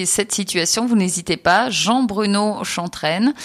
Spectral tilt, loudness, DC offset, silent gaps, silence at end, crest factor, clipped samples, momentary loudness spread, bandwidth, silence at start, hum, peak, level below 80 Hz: -3 dB/octave; -18 LUFS; under 0.1%; none; 0 s; 16 dB; under 0.1%; 6 LU; 15 kHz; 0 s; none; -4 dBFS; -54 dBFS